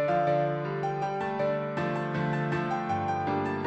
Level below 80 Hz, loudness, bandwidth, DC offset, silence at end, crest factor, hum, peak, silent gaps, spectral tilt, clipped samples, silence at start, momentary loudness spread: -64 dBFS; -29 LUFS; 8 kHz; under 0.1%; 0 s; 14 dB; none; -14 dBFS; none; -8 dB/octave; under 0.1%; 0 s; 4 LU